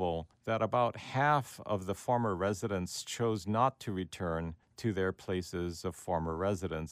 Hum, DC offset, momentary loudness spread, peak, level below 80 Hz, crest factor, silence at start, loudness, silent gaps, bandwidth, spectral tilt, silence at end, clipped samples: none; under 0.1%; 8 LU; -14 dBFS; -60 dBFS; 20 dB; 0 s; -34 LUFS; none; 15.5 kHz; -5.5 dB/octave; 0 s; under 0.1%